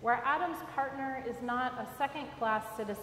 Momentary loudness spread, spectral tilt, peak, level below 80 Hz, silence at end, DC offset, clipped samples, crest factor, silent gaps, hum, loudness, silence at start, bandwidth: 7 LU; -5 dB/octave; -16 dBFS; -66 dBFS; 0 s; under 0.1%; under 0.1%; 18 dB; none; none; -35 LUFS; 0 s; 16 kHz